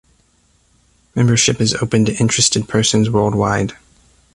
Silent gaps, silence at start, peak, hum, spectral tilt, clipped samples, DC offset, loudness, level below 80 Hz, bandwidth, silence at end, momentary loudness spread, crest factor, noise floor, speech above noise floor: none; 1.15 s; 0 dBFS; none; -4 dB/octave; under 0.1%; under 0.1%; -15 LUFS; -44 dBFS; 11.5 kHz; 0.6 s; 5 LU; 18 dB; -57 dBFS; 42 dB